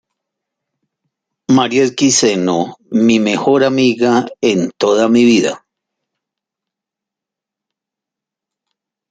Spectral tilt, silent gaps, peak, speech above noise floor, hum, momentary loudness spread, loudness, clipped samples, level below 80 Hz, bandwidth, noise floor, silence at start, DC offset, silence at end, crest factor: -4 dB/octave; none; -2 dBFS; 72 dB; none; 8 LU; -13 LUFS; under 0.1%; -60 dBFS; 9.6 kHz; -84 dBFS; 1.5 s; under 0.1%; 3.55 s; 14 dB